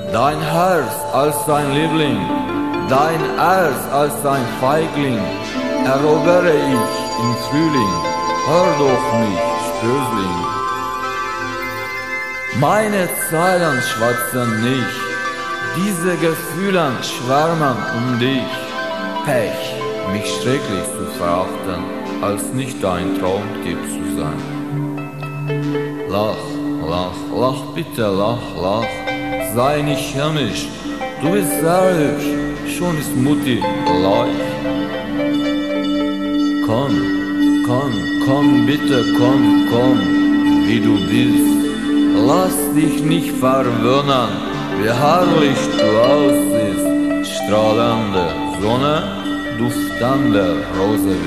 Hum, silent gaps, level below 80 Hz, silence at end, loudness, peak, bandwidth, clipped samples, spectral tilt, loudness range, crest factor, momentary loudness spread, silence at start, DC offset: none; none; -44 dBFS; 0 s; -17 LUFS; -2 dBFS; 14 kHz; under 0.1%; -5.5 dB/octave; 6 LU; 16 dB; 8 LU; 0 s; 0.7%